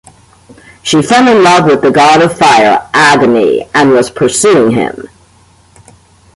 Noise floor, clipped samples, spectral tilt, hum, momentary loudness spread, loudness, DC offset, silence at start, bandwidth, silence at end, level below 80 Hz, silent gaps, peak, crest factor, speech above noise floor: -44 dBFS; under 0.1%; -4 dB/octave; none; 6 LU; -7 LUFS; under 0.1%; 0.85 s; 11.5 kHz; 1.3 s; -46 dBFS; none; 0 dBFS; 8 dB; 37 dB